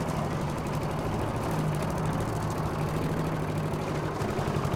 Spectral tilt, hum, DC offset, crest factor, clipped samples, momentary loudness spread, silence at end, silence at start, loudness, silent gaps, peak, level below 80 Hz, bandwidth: -6.5 dB/octave; none; under 0.1%; 14 dB; under 0.1%; 2 LU; 0 s; 0 s; -30 LUFS; none; -14 dBFS; -42 dBFS; 16.5 kHz